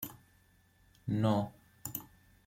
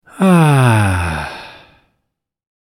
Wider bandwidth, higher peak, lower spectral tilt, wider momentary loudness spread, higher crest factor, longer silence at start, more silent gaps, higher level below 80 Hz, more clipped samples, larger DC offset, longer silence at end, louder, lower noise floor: about the same, 16.5 kHz vs 15.5 kHz; second, -16 dBFS vs 0 dBFS; about the same, -6.5 dB/octave vs -6.5 dB/octave; about the same, 15 LU vs 16 LU; first, 20 dB vs 14 dB; second, 0 s vs 0.15 s; neither; second, -66 dBFS vs -38 dBFS; neither; neither; second, 0.4 s vs 1.1 s; second, -36 LUFS vs -13 LUFS; second, -67 dBFS vs -74 dBFS